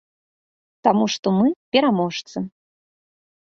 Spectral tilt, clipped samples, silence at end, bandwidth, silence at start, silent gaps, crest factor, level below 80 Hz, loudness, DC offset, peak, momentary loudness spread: -5.5 dB/octave; under 0.1%; 0.95 s; 7.2 kHz; 0.85 s; 1.19-1.23 s, 1.56-1.72 s; 20 dB; -64 dBFS; -20 LUFS; under 0.1%; -2 dBFS; 12 LU